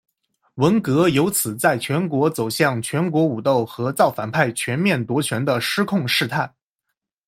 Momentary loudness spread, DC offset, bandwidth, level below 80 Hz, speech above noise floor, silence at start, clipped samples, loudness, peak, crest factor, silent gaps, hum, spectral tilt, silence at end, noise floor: 5 LU; under 0.1%; 16.5 kHz; -60 dBFS; 60 dB; 0.55 s; under 0.1%; -20 LUFS; -2 dBFS; 18 dB; none; none; -5 dB/octave; 0.8 s; -79 dBFS